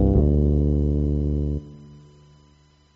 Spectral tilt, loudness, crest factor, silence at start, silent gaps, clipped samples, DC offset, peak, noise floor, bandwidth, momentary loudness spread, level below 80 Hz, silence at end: -13 dB/octave; -22 LUFS; 16 dB; 0 s; none; under 0.1%; under 0.1%; -6 dBFS; -56 dBFS; 3.2 kHz; 11 LU; -26 dBFS; 1 s